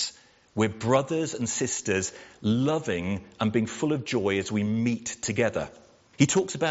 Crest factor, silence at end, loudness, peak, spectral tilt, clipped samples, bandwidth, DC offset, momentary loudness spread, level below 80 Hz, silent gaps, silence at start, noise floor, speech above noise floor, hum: 20 dB; 0 s; -27 LUFS; -6 dBFS; -5 dB/octave; under 0.1%; 8 kHz; under 0.1%; 8 LU; -62 dBFS; none; 0 s; -48 dBFS; 21 dB; none